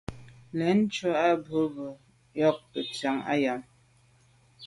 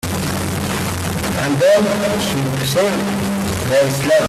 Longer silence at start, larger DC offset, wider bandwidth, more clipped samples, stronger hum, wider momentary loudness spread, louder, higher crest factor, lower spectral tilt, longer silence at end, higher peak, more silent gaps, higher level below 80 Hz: about the same, 0.1 s vs 0.05 s; neither; second, 11.5 kHz vs 16 kHz; neither; neither; first, 14 LU vs 7 LU; second, -28 LUFS vs -17 LUFS; first, 20 dB vs 12 dB; first, -6 dB/octave vs -4.5 dB/octave; about the same, 0 s vs 0 s; second, -10 dBFS vs -4 dBFS; neither; second, -62 dBFS vs -42 dBFS